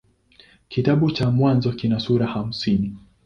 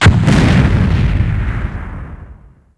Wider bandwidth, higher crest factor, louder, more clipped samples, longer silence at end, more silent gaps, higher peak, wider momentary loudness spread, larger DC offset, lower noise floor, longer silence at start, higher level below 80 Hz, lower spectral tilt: second, 7.2 kHz vs 11 kHz; about the same, 16 dB vs 12 dB; second, -21 LUFS vs -13 LUFS; neither; second, 0.25 s vs 0.45 s; neither; second, -4 dBFS vs 0 dBFS; second, 6 LU vs 18 LU; neither; first, -54 dBFS vs -39 dBFS; first, 0.7 s vs 0 s; second, -48 dBFS vs -20 dBFS; first, -8 dB/octave vs -6.5 dB/octave